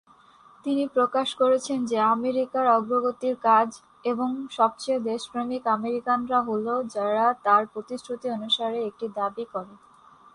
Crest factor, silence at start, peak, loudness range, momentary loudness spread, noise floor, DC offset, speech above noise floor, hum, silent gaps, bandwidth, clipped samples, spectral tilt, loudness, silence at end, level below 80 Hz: 18 dB; 0.65 s; -8 dBFS; 3 LU; 10 LU; -55 dBFS; under 0.1%; 30 dB; none; none; 11 kHz; under 0.1%; -4 dB/octave; -25 LUFS; 0.6 s; -70 dBFS